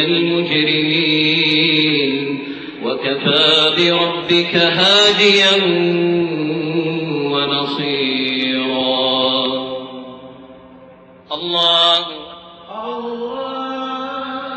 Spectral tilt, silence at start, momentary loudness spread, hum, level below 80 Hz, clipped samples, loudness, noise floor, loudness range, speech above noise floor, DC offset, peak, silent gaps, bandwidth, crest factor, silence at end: -4.5 dB/octave; 0 s; 15 LU; none; -62 dBFS; under 0.1%; -15 LUFS; -42 dBFS; 6 LU; 28 dB; under 0.1%; -2 dBFS; none; 8.4 kHz; 16 dB; 0 s